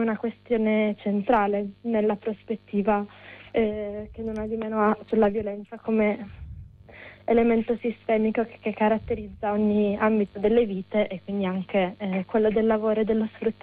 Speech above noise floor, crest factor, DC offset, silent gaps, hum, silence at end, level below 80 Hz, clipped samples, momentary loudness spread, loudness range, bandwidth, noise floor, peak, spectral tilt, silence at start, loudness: 22 dB; 14 dB; under 0.1%; none; none; 0.1 s; -50 dBFS; under 0.1%; 11 LU; 3 LU; 4.5 kHz; -47 dBFS; -10 dBFS; -9.5 dB/octave; 0 s; -25 LUFS